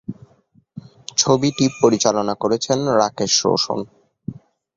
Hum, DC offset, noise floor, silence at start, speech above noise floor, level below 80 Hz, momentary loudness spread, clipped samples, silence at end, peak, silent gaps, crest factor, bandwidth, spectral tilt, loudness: none; under 0.1%; -57 dBFS; 0.1 s; 39 dB; -56 dBFS; 19 LU; under 0.1%; 0.45 s; 0 dBFS; none; 20 dB; 8 kHz; -4 dB/octave; -18 LUFS